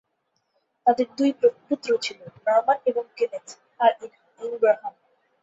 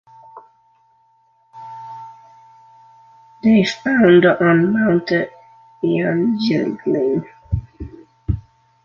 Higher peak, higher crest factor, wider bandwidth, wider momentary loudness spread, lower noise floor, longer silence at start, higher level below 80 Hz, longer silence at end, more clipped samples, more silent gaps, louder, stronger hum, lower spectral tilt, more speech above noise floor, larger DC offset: about the same, -4 dBFS vs -2 dBFS; about the same, 20 dB vs 18 dB; about the same, 8 kHz vs 7.4 kHz; second, 15 LU vs 24 LU; first, -74 dBFS vs -58 dBFS; first, 0.85 s vs 0.35 s; second, -76 dBFS vs -40 dBFS; about the same, 0.5 s vs 0.45 s; neither; neither; second, -24 LUFS vs -17 LUFS; neither; second, -4 dB/octave vs -7.5 dB/octave; first, 51 dB vs 43 dB; neither